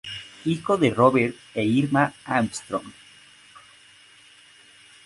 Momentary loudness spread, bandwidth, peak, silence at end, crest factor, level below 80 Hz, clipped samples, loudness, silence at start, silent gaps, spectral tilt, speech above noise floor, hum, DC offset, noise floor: 13 LU; 11.5 kHz; -4 dBFS; 2.15 s; 22 dB; -60 dBFS; under 0.1%; -23 LUFS; 0.05 s; none; -6 dB/octave; 30 dB; none; under 0.1%; -52 dBFS